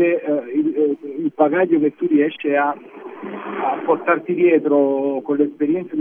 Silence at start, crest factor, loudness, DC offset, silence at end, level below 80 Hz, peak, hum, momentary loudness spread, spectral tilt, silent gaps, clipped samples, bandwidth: 0 s; 16 dB; -19 LUFS; under 0.1%; 0 s; -80 dBFS; -2 dBFS; none; 11 LU; -10 dB/octave; none; under 0.1%; 3.6 kHz